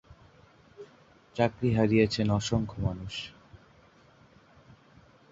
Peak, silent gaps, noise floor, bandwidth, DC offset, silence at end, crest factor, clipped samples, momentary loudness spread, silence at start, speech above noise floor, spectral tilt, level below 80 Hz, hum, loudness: -10 dBFS; none; -59 dBFS; 7.8 kHz; under 0.1%; 1.75 s; 22 dB; under 0.1%; 27 LU; 0.1 s; 32 dB; -6.5 dB/octave; -52 dBFS; none; -28 LUFS